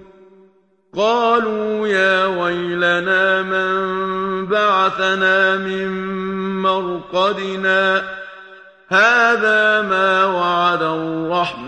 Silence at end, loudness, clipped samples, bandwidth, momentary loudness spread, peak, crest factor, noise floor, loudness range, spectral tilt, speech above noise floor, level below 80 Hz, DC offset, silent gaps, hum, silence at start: 0 s; -16 LUFS; under 0.1%; 9 kHz; 9 LU; -2 dBFS; 14 dB; -55 dBFS; 3 LU; -4.5 dB/octave; 38 dB; -56 dBFS; under 0.1%; none; none; 0 s